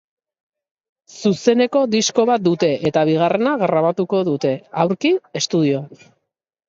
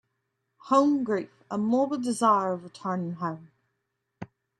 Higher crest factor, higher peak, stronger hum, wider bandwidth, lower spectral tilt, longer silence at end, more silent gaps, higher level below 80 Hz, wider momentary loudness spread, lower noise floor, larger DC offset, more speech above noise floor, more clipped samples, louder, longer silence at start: about the same, 16 dB vs 20 dB; first, -2 dBFS vs -8 dBFS; neither; second, 7.8 kHz vs 12 kHz; about the same, -5 dB/octave vs -6 dB/octave; first, 0.8 s vs 0.35 s; neither; first, -62 dBFS vs -74 dBFS; second, 5 LU vs 19 LU; second, -75 dBFS vs -80 dBFS; neither; first, 58 dB vs 54 dB; neither; first, -18 LUFS vs -27 LUFS; first, 1.15 s vs 0.65 s